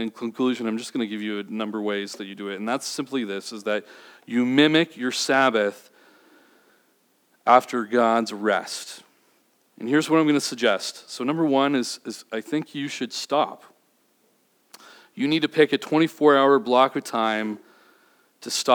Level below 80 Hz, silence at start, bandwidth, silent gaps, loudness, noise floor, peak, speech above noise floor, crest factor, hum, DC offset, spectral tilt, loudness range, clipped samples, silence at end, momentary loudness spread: under -90 dBFS; 0 s; 19.5 kHz; none; -23 LUFS; -65 dBFS; -2 dBFS; 42 dB; 22 dB; none; under 0.1%; -4 dB/octave; 7 LU; under 0.1%; 0 s; 14 LU